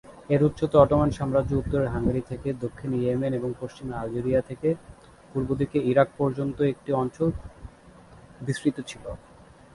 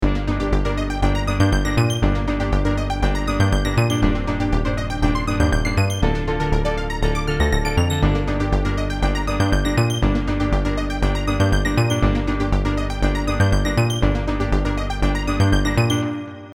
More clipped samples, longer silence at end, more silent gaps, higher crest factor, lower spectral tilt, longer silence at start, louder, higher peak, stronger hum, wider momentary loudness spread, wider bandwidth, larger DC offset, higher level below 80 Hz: neither; first, 0.6 s vs 0 s; neither; first, 22 dB vs 16 dB; first, -8 dB/octave vs -6 dB/octave; about the same, 0.05 s vs 0 s; second, -26 LUFS vs -20 LUFS; about the same, -4 dBFS vs -2 dBFS; neither; first, 14 LU vs 4 LU; second, 11.5 kHz vs 15 kHz; neither; second, -44 dBFS vs -22 dBFS